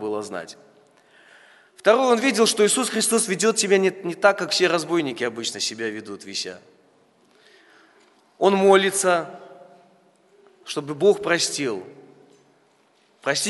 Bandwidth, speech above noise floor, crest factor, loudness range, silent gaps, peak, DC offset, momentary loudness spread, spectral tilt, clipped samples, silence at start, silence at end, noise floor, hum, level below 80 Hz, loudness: 12 kHz; 40 dB; 22 dB; 7 LU; none; -2 dBFS; under 0.1%; 14 LU; -3 dB/octave; under 0.1%; 0 s; 0 s; -61 dBFS; none; -76 dBFS; -21 LUFS